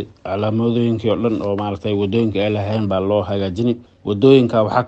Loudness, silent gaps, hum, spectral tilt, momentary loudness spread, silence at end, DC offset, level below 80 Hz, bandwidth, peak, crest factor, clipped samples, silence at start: -18 LUFS; none; none; -8.5 dB/octave; 9 LU; 0 s; under 0.1%; -50 dBFS; 8 kHz; 0 dBFS; 18 dB; under 0.1%; 0 s